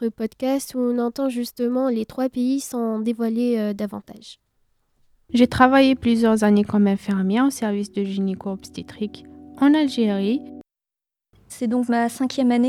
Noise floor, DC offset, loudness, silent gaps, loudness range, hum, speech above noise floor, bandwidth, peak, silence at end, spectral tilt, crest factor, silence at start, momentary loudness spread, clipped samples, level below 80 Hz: -89 dBFS; under 0.1%; -21 LUFS; none; 6 LU; none; 68 dB; 15 kHz; -2 dBFS; 0 s; -6 dB/octave; 20 dB; 0 s; 14 LU; under 0.1%; -54 dBFS